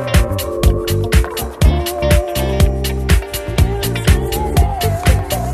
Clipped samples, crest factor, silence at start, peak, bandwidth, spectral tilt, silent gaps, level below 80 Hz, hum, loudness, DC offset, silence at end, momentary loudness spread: under 0.1%; 14 dB; 0 s; 0 dBFS; 14.5 kHz; -5.5 dB/octave; none; -18 dBFS; none; -16 LUFS; under 0.1%; 0 s; 3 LU